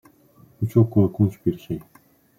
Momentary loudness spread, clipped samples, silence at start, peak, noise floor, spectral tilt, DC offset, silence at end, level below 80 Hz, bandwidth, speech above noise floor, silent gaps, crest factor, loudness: 14 LU; under 0.1%; 0.6 s; -4 dBFS; -54 dBFS; -10.5 dB/octave; under 0.1%; 0.6 s; -54 dBFS; 15.5 kHz; 33 dB; none; 18 dB; -22 LUFS